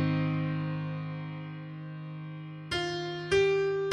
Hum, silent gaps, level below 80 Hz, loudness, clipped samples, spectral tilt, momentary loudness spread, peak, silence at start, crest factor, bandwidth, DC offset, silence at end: none; none; -58 dBFS; -32 LUFS; under 0.1%; -6.5 dB/octave; 15 LU; -10 dBFS; 0 s; 22 dB; 10.5 kHz; under 0.1%; 0 s